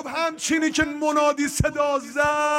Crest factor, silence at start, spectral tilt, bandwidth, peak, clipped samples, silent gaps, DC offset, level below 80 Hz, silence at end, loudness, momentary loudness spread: 16 dB; 0 s; -4 dB/octave; 16.5 kHz; -8 dBFS; under 0.1%; none; under 0.1%; -42 dBFS; 0 s; -22 LUFS; 3 LU